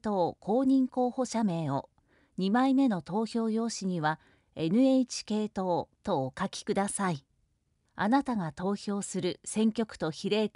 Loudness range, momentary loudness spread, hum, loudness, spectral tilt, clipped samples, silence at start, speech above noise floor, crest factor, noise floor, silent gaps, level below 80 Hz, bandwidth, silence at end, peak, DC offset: 3 LU; 9 LU; none; -30 LUFS; -5.5 dB/octave; under 0.1%; 0.05 s; 45 dB; 16 dB; -74 dBFS; none; -66 dBFS; 11.5 kHz; 0.05 s; -14 dBFS; under 0.1%